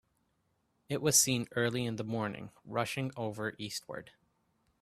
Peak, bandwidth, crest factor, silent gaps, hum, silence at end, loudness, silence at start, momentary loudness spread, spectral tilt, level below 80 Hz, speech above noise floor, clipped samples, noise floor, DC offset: -10 dBFS; 15.5 kHz; 24 dB; none; none; 0.7 s; -33 LUFS; 0.9 s; 15 LU; -3 dB/octave; -70 dBFS; 43 dB; under 0.1%; -77 dBFS; under 0.1%